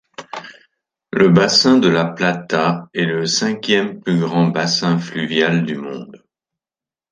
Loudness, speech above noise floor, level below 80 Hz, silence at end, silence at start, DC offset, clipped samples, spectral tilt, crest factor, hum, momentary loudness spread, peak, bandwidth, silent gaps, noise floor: -16 LUFS; over 74 dB; -58 dBFS; 0.95 s; 0.2 s; under 0.1%; under 0.1%; -5 dB/octave; 18 dB; none; 17 LU; 0 dBFS; 9.8 kHz; none; under -90 dBFS